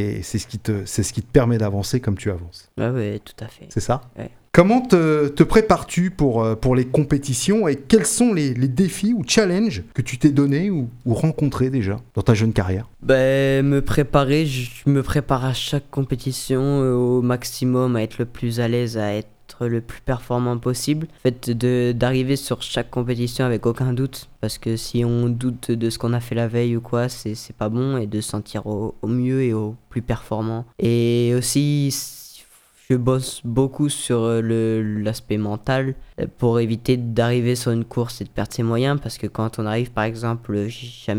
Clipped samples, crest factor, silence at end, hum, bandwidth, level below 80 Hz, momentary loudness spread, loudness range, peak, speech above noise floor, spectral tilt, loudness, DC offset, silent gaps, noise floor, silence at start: under 0.1%; 20 dB; 0 s; none; 17 kHz; -42 dBFS; 10 LU; 5 LU; 0 dBFS; 31 dB; -6 dB/octave; -21 LUFS; under 0.1%; none; -51 dBFS; 0 s